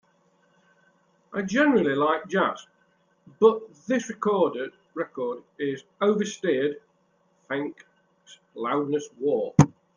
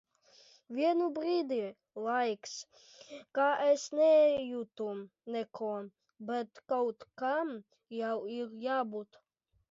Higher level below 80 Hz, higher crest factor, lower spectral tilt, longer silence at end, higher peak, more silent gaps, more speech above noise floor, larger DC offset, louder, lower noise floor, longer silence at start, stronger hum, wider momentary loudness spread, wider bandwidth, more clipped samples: first, -64 dBFS vs -80 dBFS; first, 24 dB vs 16 dB; first, -6.5 dB/octave vs -4 dB/octave; second, 0.25 s vs 0.65 s; first, -2 dBFS vs -18 dBFS; neither; first, 42 dB vs 30 dB; neither; first, -25 LUFS vs -33 LUFS; first, -67 dBFS vs -63 dBFS; first, 1.3 s vs 0.7 s; neither; second, 13 LU vs 17 LU; first, 10 kHz vs 7.8 kHz; neither